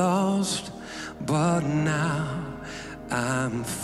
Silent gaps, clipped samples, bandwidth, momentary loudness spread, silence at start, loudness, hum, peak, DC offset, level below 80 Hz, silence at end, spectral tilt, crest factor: none; under 0.1%; 13.5 kHz; 13 LU; 0 s; -27 LUFS; none; -12 dBFS; under 0.1%; -52 dBFS; 0 s; -5 dB/octave; 14 dB